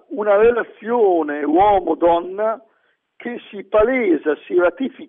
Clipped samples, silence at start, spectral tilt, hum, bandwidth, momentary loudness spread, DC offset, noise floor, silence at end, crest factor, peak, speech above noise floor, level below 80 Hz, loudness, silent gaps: under 0.1%; 0.1 s; -9 dB/octave; none; 3.8 kHz; 16 LU; under 0.1%; -64 dBFS; 0.05 s; 14 dB; -4 dBFS; 46 dB; -46 dBFS; -17 LUFS; none